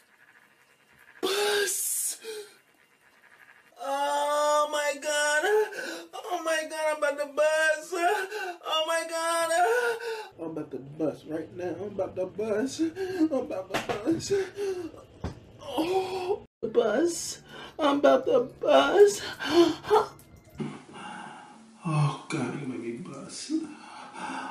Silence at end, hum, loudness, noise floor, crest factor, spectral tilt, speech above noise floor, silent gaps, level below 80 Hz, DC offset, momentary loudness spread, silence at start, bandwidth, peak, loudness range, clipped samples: 0 s; none; -27 LUFS; -62 dBFS; 20 dB; -4 dB/octave; 36 dB; 16.47-16.61 s; -62 dBFS; under 0.1%; 16 LU; 1.2 s; 15 kHz; -8 dBFS; 8 LU; under 0.1%